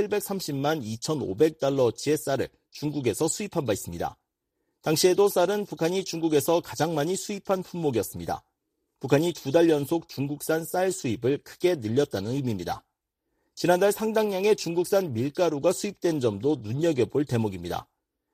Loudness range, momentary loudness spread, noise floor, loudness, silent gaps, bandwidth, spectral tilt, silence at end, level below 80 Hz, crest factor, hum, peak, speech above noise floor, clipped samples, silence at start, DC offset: 3 LU; 10 LU; -80 dBFS; -26 LUFS; none; 15.5 kHz; -5 dB/octave; 0.5 s; -60 dBFS; 18 dB; none; -8 dBFS; 54 dB; under 0.1%; 0 s; under 0.1%